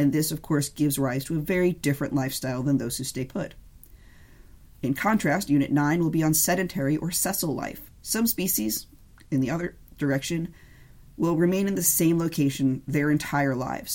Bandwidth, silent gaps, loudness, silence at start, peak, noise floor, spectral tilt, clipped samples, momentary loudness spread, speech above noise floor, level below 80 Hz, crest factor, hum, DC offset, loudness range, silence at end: 17 kHz; none; -25 LUFS; 0 s; -8 dBFS; -50 dBFS; -5 dB/octave; under 0.1%; 10 LU; 25 dB; -52 dBFS; 18 dB; none; under 0.1%; 4 LU; 0 s